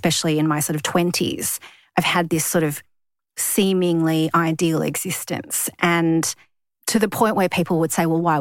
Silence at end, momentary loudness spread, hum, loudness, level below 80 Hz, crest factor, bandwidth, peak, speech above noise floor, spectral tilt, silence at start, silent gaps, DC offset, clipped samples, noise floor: 0 s; 7 LU; none; -20 LUFS; -60 dBFS; 16 dB; 17 kHz; -4 dBFS; 37 dB; -4 dB/octave; 0.05 s; none; under 0.1%; under 0.1%; -57 dBFS